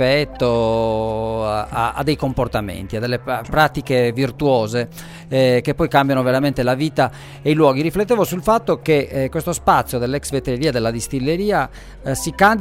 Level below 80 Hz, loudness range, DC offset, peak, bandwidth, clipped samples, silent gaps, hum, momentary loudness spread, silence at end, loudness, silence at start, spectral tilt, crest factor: -38 dBFS; 3 LU; under 0.1%; 0 dBFS; 16 kHz; under 0.1%; none; none; 7 LU; 0 s; -19 LUFS; 0 s; -5.5 dB/octave; 18 dB